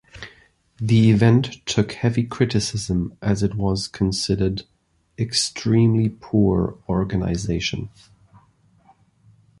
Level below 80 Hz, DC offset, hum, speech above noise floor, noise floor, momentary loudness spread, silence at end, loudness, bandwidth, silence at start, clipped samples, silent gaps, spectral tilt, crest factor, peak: -40 dBFS; under 0.1%; none; 37 dB; -57 dBFS; 12 LU; 1.7 s; -21 LUFS; 11.5 kHz; 0.15 s; under 0.1%; none; -6 dB/octave; 20 dB; -2 dBFS